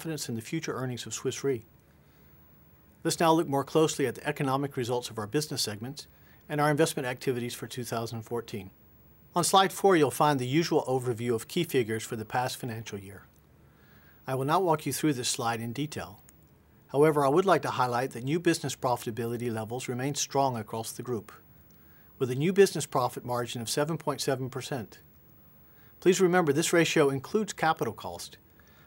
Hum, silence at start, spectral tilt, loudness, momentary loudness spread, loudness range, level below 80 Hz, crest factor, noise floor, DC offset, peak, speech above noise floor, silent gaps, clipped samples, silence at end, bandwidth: none; 0 s; -4.5 dB/octave; -29 LUFS; 13 LU; 5 LU; -68 dBFS; 20 dB; -59 dBFS; under 0.1%; -8 dBFS; 31 dB; none; under 0.1%; 0.5 s; 16 kHz